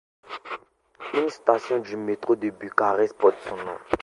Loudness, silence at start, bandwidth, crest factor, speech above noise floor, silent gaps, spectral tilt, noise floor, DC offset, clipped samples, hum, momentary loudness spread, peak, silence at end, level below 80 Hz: -25 LUFS; 0.3 s; 11 kHz; 24 dB; 21 dB; none; -5.5 dB/octave; -45 dBFS; under 0.1%; under 0.1%; none; 17 LU; -2 dBFS; 0.05 s; -60 dBFS